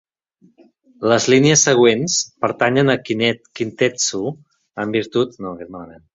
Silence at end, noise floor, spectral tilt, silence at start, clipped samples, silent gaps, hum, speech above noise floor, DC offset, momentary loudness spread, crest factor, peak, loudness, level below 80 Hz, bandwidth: 0.2 s; -56 dBFS; -3.5 dB/octave; 1 s; under 0.1%; none; none; 39 dB; under 0.1%; 18 LU; 18 dB; -2 dBFS; -17 LUFS; -58 dBFS; 8 kHz